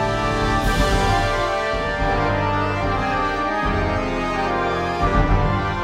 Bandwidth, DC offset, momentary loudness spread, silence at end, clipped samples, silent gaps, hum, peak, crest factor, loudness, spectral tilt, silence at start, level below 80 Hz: 15 kHz; under 0.1%; 3 LU; 0 s; under 0.1%; none; none; -4 dBFS; 16 dB; -20 LUFS; -5.5 dB/octave; 0 s; -26 dBFS